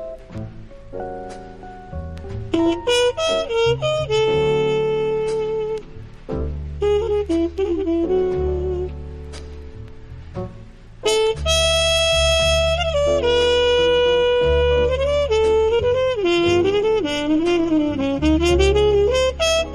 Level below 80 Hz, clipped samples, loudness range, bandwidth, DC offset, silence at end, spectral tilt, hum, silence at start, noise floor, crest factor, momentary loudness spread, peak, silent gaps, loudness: -32 dBFS; under 0.1%; 7 LU; 13 kHz; under 0.1%; 0 s; -4.5 dB/octave; none; 0 s; -39 dBFS; 14 dB; 18 LU; -4 dBFS; none; -18 LUFS